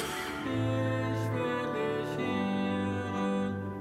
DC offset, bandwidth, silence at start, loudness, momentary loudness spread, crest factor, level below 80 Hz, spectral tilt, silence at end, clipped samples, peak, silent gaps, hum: under 0.1%; 15.5 kHz; 0 s; -32 LUFS; 3 LU; 12 dB; -60 dBFS; -6.5 dB/octave; 0 s; under 0.1%; -20 dBFS; none; none